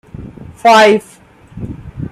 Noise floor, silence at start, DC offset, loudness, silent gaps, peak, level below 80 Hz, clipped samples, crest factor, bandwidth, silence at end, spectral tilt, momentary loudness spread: -31 dBFS; 0.2 s; under 0.1%; -9 LUFS; none; 0 dBFS; -40 dBFS; under 0.1%; 14 dB; 15.5 kHz; 0.05 s; -4.5 dB/octave; 25 LU